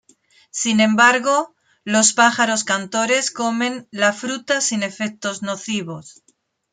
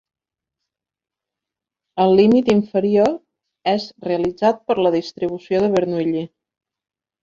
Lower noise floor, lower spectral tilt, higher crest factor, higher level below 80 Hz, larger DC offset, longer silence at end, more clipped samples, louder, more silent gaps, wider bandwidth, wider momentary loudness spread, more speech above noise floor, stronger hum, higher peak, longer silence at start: second, -63 dBFS vs -86 dBFS; second, -2.5 dB/octave vs -7 dB/octave; about the same, 18 dB vs 18 dB; second, -68 dBFS vs -58 dBFS; neither; second, 0.6 s vs 0.95 s; neither; about the same, -18 LUFS vs -18 LUFS; neither; first, 9.6 kHz vs 7.6 kHz; about the same, 13 LU vs 12 LU; second, 44 dB vs 69 dB; neither; about the same, -2 dBFS vs -2 dBFS; second, 0.55 s vs 1.95 s